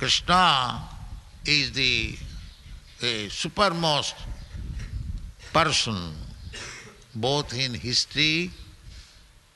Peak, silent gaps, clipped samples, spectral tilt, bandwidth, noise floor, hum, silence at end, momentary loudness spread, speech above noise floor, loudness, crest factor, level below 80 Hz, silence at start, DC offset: -4 dBFS; none; under 0.1%; -3 dB/octave; 12 kHz; -53 dBFS; none; 0.5 s; 20 LU; 28 dB; -23 LUFS; 24 dB; -42 dBFS; 0 s; under 0.1%